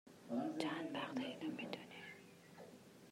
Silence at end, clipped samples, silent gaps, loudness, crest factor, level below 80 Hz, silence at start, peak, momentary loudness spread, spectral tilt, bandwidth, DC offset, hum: 0 s; under 0.1%; none; -46 LUFS; 22 dB; -90 dBFS; 0.05 s; -26 dBFS; 17 LU; -5 dB/octave; 16 kHz; under 0.1%; none